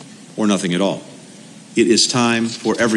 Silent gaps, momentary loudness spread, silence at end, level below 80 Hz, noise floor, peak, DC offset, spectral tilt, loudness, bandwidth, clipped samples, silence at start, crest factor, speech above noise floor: none; 10 LU; 0 s; -60 dBFS; -40 dBFS; -2 dBFS; under 0.1%; -3.5 dB/octave; -17 LUFS; 12 kHz; under 0.1%; 0 s; 16 dB; 23 dB